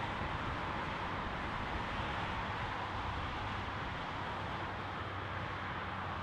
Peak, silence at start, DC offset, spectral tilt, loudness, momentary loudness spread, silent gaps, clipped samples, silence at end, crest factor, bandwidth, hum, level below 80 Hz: -26 dBFS; 0 s; under 0.1%; -5.5 dB/octave; -39 LUFS; 2 LU; none; under 0.1%; 0 s; 14 dB; 11.5 kHz; none; -50 dBFS